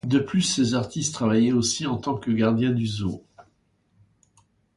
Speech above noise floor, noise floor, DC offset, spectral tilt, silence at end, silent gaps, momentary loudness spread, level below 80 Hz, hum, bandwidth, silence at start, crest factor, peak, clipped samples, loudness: 44 dB; -66 dBFS; under 0.1%; -5 dB/octave; 1.35 s; none; 7 LU; -54 dBFS; none; 11.5 kHz; 0.05 s; 16 dB; -8 dBFS; under 0.1%; -23 LUFS